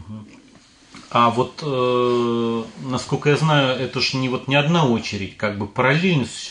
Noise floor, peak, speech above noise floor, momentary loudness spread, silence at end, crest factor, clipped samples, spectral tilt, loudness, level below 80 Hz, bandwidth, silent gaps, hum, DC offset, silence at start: -50 dBFS; -4 dBFS; 30 dB; 9 LU; 0 s; 18 dB; under 0.1%; -5.5 dB/octave; -20 LUFS; -58 dBFS; 10.5 kHz; none; none; under 0.1%; 0 s